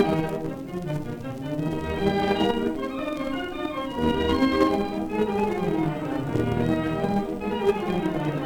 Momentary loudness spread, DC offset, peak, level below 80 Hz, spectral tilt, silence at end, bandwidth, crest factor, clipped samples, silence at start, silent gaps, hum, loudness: 8 LU; under 0.1%; -6 dBFS; -44 dBFS; -7 dB/octave; 0 s; 19 kHz; 18 dB; under 0.1%; 0 s; none; none; -26 LUFS